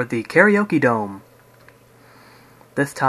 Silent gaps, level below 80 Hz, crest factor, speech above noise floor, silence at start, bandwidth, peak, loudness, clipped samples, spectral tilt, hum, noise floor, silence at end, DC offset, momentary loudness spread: none; -62 dBFS; 20 dB; 32 dB; 0 s; 14 kHz; 0 dBFS; -18 LUFS; under 0.1%; -6.5 dB/octave; none; -50 dBFS; 0 s; under 0.1%; 16 LU